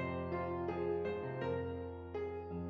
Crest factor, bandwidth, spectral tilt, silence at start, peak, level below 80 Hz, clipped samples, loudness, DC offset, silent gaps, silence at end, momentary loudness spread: 14 dB; 6.2 kHz; -7 dB/octave; 0 s; -26 dBFS; -66 dBFS; under 0.1%; -40 LUFS; under 0.1%; none; 0 s; 5 LU